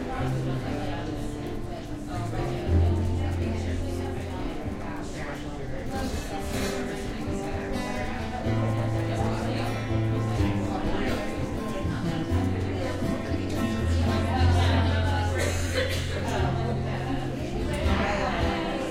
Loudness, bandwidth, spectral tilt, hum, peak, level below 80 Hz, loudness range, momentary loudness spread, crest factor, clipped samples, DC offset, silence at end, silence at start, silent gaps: -28 LUFS; 15 kHz; -6.5 dB/octave; none; -12 dBFS; -36 dBFS; 6 LU; 9 LU; 16 dB; under 0.1%; under 0.1%; 0 s; 0 s; none